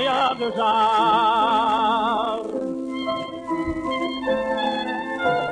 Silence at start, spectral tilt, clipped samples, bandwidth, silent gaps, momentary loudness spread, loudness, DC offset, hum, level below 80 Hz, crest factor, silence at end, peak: 0 s; -5 dB/octave; under 0.1%; 10.5 kHz; none; 10 LU; -22 LUFS; under 0.1%; none; -50 dBFS; 12 dB; 0 s; -10 dBFS